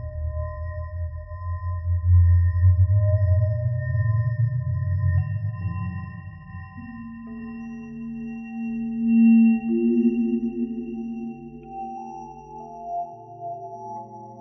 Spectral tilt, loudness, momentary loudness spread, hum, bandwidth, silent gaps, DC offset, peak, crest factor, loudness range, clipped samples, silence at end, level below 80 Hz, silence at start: -11 dB/octave; -23 LUFS; 19 LU; none; 2.9 kHz; none; under 0.1%; -10 dBFS; 14 dB; 13 LU; under 0.1%; 0 s; -38 dBFS; 0 s